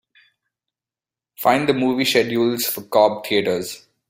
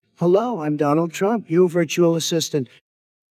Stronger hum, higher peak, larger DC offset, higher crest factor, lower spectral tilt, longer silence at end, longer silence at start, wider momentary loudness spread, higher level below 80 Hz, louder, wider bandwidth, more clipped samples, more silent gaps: neither; first, -2 dBFS vs -6 dBFS; neither; first, 20 dB vs 14 dB; second, -4 dB/octave vs -5.5 dB/octave; second, 0.35 s vs 0.65 s; first, 1.4 s vs 0.2 s; about the same, 6 LU vs 6 LU; first, -60 dBFS vs -74 dBFS; about the same, -19 LUFS vs -20 LUFS; about the same, 16.5 kHz vs 16 kHz; neither; neither